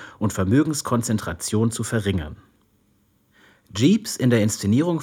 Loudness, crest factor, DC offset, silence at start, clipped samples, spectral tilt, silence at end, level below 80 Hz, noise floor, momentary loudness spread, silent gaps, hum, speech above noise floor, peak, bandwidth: -22 LUFS; 16 dB; under 0.1%; 0 s; under 0.1%; -5.5 dB/octave; 0 s; -52 dBFS; -63 dBFS; 7 LU; none; none; 42 dB; -6 dBFS; 17.5 kHz